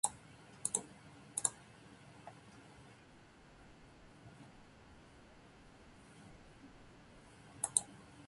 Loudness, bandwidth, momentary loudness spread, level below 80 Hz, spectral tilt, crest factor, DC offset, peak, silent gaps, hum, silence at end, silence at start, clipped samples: -38 LUFS; 11.5 kHz; 24 LU; -70 dBFS; -1.5 dB/octave; 38 dB; under 0.1%; -10 dBFS; none; none; 0 s; 0.05 s; under 0.1%